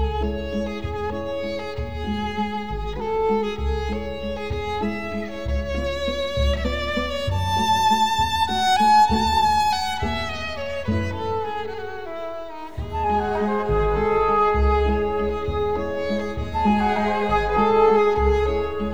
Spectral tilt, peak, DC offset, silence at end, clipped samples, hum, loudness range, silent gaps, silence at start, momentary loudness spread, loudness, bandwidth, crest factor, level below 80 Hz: -5.5 dB/octave; -6 dBFS; 1%; 0 s; under 0.1%; none; 7 LU; none; 0 s; 11 LU; -22 LUFS; over 20 kHz; 16 dB; -32 dBFS